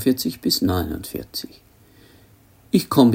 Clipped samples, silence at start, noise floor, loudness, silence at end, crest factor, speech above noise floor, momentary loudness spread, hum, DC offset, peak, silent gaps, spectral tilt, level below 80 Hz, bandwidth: under 0.1%; 0 s; -52 dBFS; -22 LUFS; 0 s; 20 dB; 32 dB; 13 LU; none; under 0.1%; -2 dBFS; none; -5.5 dB/octave; -50 dBFS; 17 kHz